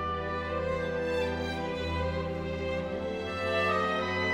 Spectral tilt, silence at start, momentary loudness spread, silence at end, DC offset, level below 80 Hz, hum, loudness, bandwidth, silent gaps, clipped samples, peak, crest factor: -6 dB/octave; 0 s; 6 LU; 0 s; under 0.1%; -46 dBFS; none; -31 LUFS; 12 kHz; none; under 0.1%; -16 dBFS; 14 dB